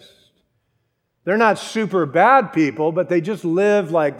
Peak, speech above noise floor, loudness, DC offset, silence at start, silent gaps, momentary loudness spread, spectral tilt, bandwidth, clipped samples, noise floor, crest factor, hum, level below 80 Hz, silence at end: 0 dBFS; 53 dB; -17 LUFS; under 0.1%; 1.25 s; none; 8 LU; -6 dB/octave; 13 kHz; under 0.1%; -70 dBFS; 18 dB; none; -74 dBFS; 0 s